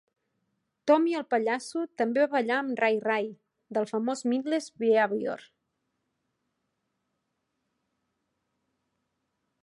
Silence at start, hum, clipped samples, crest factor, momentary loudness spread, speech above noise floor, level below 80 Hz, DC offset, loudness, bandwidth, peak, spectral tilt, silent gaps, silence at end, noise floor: 0.85 s; none; under 0.1%; 20 dB; 10 LU; 53 dB; -84 dBFS; under 0.1%; -28 LUFS; 11.5 kHz; -10 dBFS; -4.5 dB/octave; none; 4.2 s; -80 dBFS